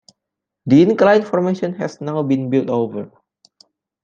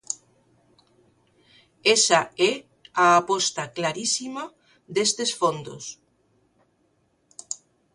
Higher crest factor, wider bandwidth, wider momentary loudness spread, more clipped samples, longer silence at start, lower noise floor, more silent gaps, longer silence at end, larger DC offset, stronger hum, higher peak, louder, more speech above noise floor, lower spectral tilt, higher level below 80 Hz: second, 16 dB vs 22 dB; second, 7.4 kHz vs 11.5 kHz; second, 15 LU vs 18 LU; neither; first, 0.65 s vs 0.1 s; first, -82 dBFS vs -67 dBFS; neither; first, 0.95 s vs 0.4 s; neither; neither; about the same, -2 dBFS vs -4 dBFS; first, -17 LUFS vs -22 LUFS; first, 66 dB vs 45 dB; first, -8 dB/octave vs -2 dB/octave; first, -64 dBFS vs -70 dBFS